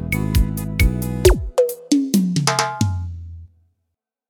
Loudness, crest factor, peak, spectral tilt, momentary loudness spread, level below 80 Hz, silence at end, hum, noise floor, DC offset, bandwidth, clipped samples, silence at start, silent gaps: -19 LUFS; 20 dB; 0 dBFS; -5.5 dB/octave; 11 LU; -26 dBFS; 0.85 s; none; -77 dBFS; under 0.1%; over 20 kHz; under 0.1%; 0 s; none